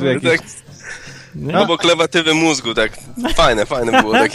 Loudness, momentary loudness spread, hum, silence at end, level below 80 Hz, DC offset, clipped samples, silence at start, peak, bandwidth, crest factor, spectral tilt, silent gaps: -15 LUFS; 19 LU; none; 0 s; -34 dBFS; under 0.1%; under 0.1%; 0 s; 0 dBFS; 14.5 kHz; 16 dB; -4 dB/octave; none